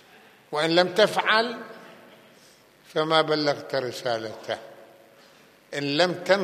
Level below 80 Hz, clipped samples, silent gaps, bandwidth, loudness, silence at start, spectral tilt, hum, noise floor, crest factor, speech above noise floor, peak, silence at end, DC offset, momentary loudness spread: -78 dBFS; under 0.1%; none; 15 kHz; -24 LUFS; 0.5 s; -4 dB/octave; none; -55 dBFS; 24 dB; 31 dB; -2 dBFS; 0 s; under 0.1%; 13 LU